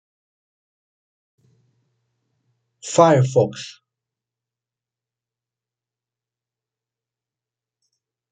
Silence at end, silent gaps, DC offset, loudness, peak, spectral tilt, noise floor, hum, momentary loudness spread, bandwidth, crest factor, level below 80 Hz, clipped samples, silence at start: 4.6 s; none; under 0.1%; -17 LUFS; -2 dBFS; -6 dB/octave; -89 dBFS; none; 22 LU; 9.4 kHz; 24 dB; -68 dBFS; under 0.1%; 2.85 s